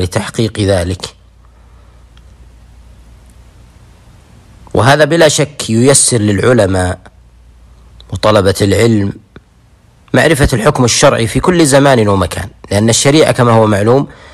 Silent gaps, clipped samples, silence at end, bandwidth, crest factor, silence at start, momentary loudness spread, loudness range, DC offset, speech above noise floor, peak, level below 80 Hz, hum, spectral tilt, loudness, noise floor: none; under 0.1%; 0.2 s; 15.5 kHz; 12 dB; 0 s; 11 LU; 10 LU; under 0.1%; 36 dB; 0 dBFS; -32 dBFS; none; -4.5 dB/octave; -10 LUFS; -45 dBFS